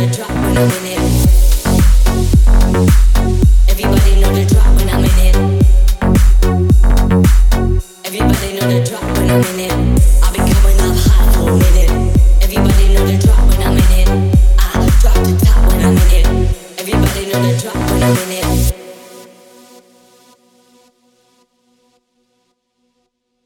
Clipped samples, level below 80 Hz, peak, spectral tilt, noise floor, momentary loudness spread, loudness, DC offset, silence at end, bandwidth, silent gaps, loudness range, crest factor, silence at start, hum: under 0.1%; -12 dBFS; 0 dBFS; -6 dB/octave; -66 dBFS; 5 LU; -12 LUFS; under 0.1%; 4.25 s; 17 kHz; none; 5 LU; 10 dB; 0 s; none